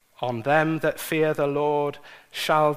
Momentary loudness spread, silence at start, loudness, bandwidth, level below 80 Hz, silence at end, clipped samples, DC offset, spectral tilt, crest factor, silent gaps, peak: 9 LU; 0.2 s; -24 LUFS; 15.5 kHz; -62 dBFS; 0 s; under 0.1%; under 0.1%; -5.5 dB/octave; 18 dB; none; -6 dBFS